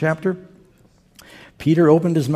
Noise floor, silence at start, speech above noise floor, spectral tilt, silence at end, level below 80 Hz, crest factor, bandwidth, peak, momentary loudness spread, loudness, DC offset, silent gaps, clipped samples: -54 dBFS; 0 s; 37 dB; -8 dB/octave; 0 s; -56 dBFS; 18 dB; 14.5 kHz; -2 dBFS; 11 LU; -17 LUFS; under 0.1%; none; under 0.1%